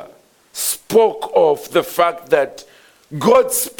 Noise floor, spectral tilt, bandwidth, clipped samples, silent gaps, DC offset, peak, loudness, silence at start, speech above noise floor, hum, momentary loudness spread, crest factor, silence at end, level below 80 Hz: -47 dBFS; -3.5 dB/octave; 19 kHz; under 0.1%; none; under 0.1%; 0 dBFS; -16 LUFS; 0 s; 32 dB; none; 9 LU; 16 dB; 0.1 s; -58 dBFS